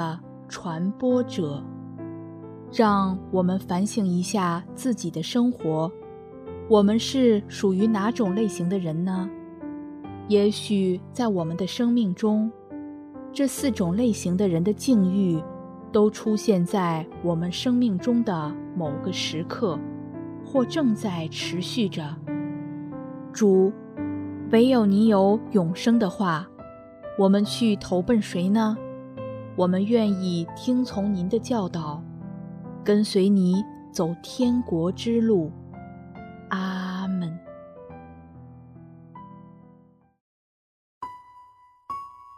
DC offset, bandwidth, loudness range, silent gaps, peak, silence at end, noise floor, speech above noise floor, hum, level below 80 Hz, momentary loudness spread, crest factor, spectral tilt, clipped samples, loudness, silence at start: under 0.1%; 14 kHz; 5 LU; 40.21-41.01 s; -6 dBFS; 0 s; -56 dBFS; 33 dB; none; -62 dBFS; 18 LU; 18 dB; -6.5 dB/octave; under 0.1%; -24 LUFS; 0 s